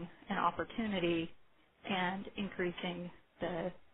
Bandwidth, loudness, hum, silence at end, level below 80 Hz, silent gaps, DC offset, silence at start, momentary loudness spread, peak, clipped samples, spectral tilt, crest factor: 4 kHz; -38 LUFS; none; 0.05 s; -64 dBFS; none; under 0.1%; 0 s; 11 LU; -18 dBFS; under 0.1%; -3.5 dB/octave; 20 dB